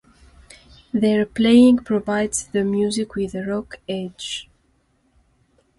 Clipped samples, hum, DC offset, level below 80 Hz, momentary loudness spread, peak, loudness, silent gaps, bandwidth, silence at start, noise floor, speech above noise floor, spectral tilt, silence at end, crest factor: under 0.1%; none; under 0.1%; -52 dBFS; 16 LU; -4 dBFS; -20 LUFS; none; 11.5 kHz; 0.95 s; -63 dBFS; 44 dB; -5 dB/octave; 1.35 s; 18 dB